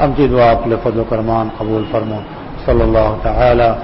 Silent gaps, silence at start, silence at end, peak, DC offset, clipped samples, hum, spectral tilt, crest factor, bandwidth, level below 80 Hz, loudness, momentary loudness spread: none; 0 s; 0 s; -2 dBFS; under 0.1%; under 0.1%; none; -12 dB/octave; 12 dB; 5.8 kHz; -24 dBFS; -14 LUFS; 10 LU